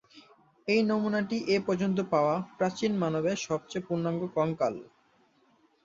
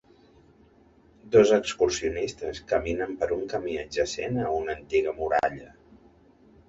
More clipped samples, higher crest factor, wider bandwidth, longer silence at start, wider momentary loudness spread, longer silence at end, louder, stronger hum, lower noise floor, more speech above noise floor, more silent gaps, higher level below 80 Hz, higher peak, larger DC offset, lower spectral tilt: neither; about the same, 18 dB vs 22 dB; about the same, 7.8 kHz vs 8 kHz; second, 0.15 s vs 1.25 s; second, 6 LU vs 10 LU; about the same, 1 s vs 1 s; second, -29 LUFS vs -26 LUFS; neither; first, -66 dBFS vs -58 dBFS; first, 38 dB vs 32 dB; neither; second, -68 dBFS vs -50 dBFS; second, -12 dBFS vs -6 dBFS; neither; first, -6 dB/octave vs -4.5 dB/octave